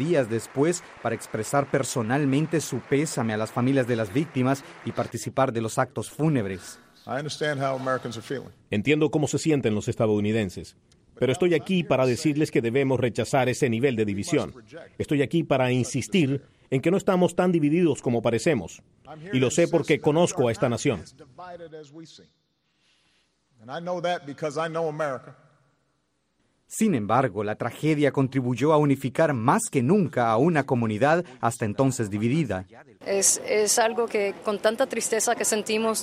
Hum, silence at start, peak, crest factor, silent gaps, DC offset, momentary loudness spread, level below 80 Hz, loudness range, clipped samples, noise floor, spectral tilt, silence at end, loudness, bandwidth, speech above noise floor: none; 0 s; -6 dBFS; 18 dB; none; under 0.1%; 11 LU; -60 dBFS; 9 LU; under 0.1%; -73 dBFS; -5 dB/octave; 0 s; -24 LUFS; 15.5 kHz; 48 dB